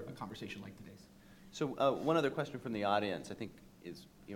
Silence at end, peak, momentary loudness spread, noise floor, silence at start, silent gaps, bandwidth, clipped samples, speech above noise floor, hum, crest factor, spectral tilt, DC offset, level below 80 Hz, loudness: 0 s; -18 dBFS; 19 LU; -59 dBFS; 0 s; none; 17 kHz; under 0.1%; 22 dB; none; 20 dB; -5.5 dB/octave; under 0.1%; -68 dBFS; -37 LUFS